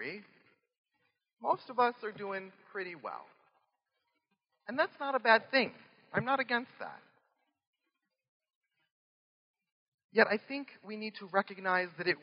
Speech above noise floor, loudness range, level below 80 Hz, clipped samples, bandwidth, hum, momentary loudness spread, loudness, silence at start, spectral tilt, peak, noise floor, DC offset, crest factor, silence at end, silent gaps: 53 dB; 8 LU; under -90 dBFS; under 0.1%; 5.4 kHz; none; 17 LU; -33 LUFS; 0 s; -1.5 dB/octave; -8 dBFS; -86 dBFS; under 0.1%; 28 dB; 0.05 s; 0.78-0.84 s, 1.33-1.37 s, 7.67-7.73 s, 8.28-8.40 s, 8.55-8.61 s, 8.92-9.54 s, 9.72-9.98 s, 10.04-10.09 s